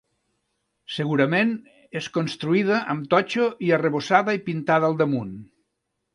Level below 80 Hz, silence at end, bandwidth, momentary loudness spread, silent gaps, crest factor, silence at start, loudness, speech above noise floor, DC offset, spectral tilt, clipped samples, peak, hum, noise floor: -66 dBFS; 0.7 s; 11.5 kHz; 13 LU; none; 22 dB; 0.9 s; -22 LUFS; 56 dB; under 0.1%; -6.5 dB/octave; under 0.1%; -2 dBFS; none; -78 dBFS